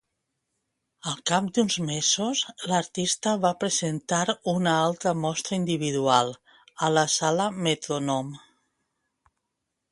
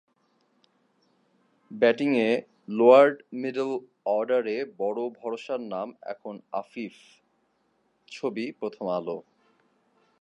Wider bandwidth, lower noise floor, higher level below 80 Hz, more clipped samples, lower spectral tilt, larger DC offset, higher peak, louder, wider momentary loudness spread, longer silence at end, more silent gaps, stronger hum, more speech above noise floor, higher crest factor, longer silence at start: first, 11.5 kHz vs 9 kHz; first, -82 dBFS vs -71 dBFS; first, -68 dBFS vs -84 dBFS; neither; second, -3.5 dB/octave vs -6 dB/octave; neither; about the same, -6 dBFS vs -4 dBFS; about the same, -25 LUFS vs -26 LUFS; second, 6 LU vs 19 LU; first, 1.55 s vs 1 s; neither; neither; first, 56 dB vs 45 dB; about the same, 22 dB vs 24 dB; second, 1.05 s vs 1.7 s